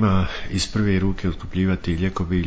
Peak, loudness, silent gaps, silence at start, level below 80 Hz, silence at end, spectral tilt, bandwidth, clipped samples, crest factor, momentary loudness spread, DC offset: -8 dBFS; -23 LUFS; none; 0 s; -32 dBFS; 0 s; -6 dB/octave; 8 kHz; under 0.1%; 12 dB; 5 LU; under 0.1%